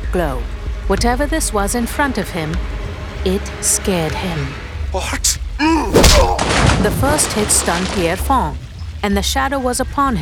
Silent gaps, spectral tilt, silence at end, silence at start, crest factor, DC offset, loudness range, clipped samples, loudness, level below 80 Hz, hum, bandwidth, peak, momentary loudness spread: none; -3.5 dB/octave; 0 s; 0 s; 16 dB; under 0.1%; 5 LU; under 0.1%; -16 LUFS; -22 dBFS; none; 19.5 kHz; 0 dBFS; 11 LU